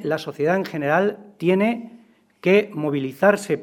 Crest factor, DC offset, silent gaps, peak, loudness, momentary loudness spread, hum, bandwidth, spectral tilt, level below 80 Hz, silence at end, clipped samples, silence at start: 18 dB; under 0.1%; none; -2 dBFS; -21 LUFS; 7 LU; none; 16.5 kHz; -6.5 dB/octave; -68 dBFS; 0 s; under 0.1%; 0 s